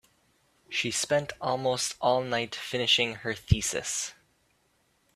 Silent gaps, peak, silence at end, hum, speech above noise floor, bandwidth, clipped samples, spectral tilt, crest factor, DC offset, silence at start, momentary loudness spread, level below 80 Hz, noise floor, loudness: none; -8 dBFS; 1.05 s; none; 41 dB; 15.5 kHz; under 0.1%; -3 dB/octave; 22 dB; under 0.1%; 0.7 s; 9 LU; -48 dBFS; -70 dBFS; -28 LUFS